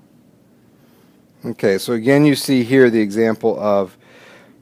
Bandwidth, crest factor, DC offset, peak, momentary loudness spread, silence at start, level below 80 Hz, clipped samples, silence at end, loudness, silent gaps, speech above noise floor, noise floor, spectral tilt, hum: 16 kHz; 18 dB; under 0.1%; 0 dBFS; 10 LU; 1.45 s; -66 dBFS; under 0.1%; 0.75 s; -16 LUFS; none; 36 dB; -51 dBFS; -6 dB/octave; none